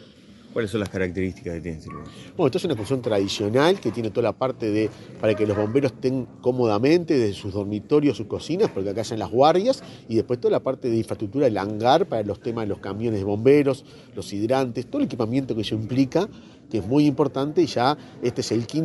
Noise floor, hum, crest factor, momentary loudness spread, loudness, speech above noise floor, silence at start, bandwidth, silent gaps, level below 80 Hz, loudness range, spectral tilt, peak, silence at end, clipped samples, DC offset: -48 dBFS; none; 20 dB; 10 LU; -23 LUFS; 25 dB; 0 s; 11.5 kHz; none; -56 dBFS; 2 LU; -6.5 dB/octave; -4 dBFS; 0 s; under 0.1%; under 0.1%